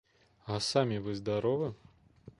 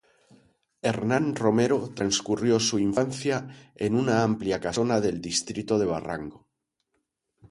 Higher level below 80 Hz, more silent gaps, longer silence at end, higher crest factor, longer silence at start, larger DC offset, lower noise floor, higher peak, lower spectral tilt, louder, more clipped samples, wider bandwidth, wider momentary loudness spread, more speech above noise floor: second, -62 dBFS vs -56 dBFS; neither; second, 0.1 s vs 1.15 s; about the same, 22 dB vs 20 dB; second, 0.45 s vs 0.85 s; neither; second, -57 dBFS vs -79 dBFS; second, -14 dBFS vs -8 dBFS; about the same, -5.5 dB/octave vs -4.5 dB/octave; second, -33 LUFS vs -26 LUFS; neither; about the same, 11.5 kHz vs 11.5 kHz; about the same, 9 LU vs 9 LU; second, 25 dB vs 54 dB